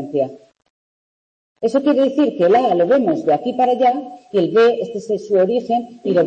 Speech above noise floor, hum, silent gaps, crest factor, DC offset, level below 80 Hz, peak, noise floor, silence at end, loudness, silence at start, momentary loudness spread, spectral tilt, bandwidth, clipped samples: over 74 dB; none; 0.70-1.55 s; 12 dB; under 0.1%; -68 dBFS; -4 dBFS; under -90 dBFS; 0 s; -17 LUFS; 0 s; 9 LU; -7 dB/octave; 8.6 kHz; under 0.1%